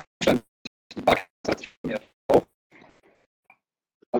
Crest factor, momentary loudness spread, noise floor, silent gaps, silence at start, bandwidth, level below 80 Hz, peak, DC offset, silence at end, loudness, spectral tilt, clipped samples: 24 dB; 15 LU; -56 dBFS; 0.48-0.90 s, 1.30-1.44 s, 1.77-1.84 s, 2.14-2.29 s, 2.54-2.70 s, 3.26-3.43 s, 3.94-4.00 s, 4.06-4.13 s; 0.2 s; 19.5 kHz; -54 dBFS; -4 dBFS; under 0.1%; 0 s; -26 LUFS; -5 dB/octave; under 0.1%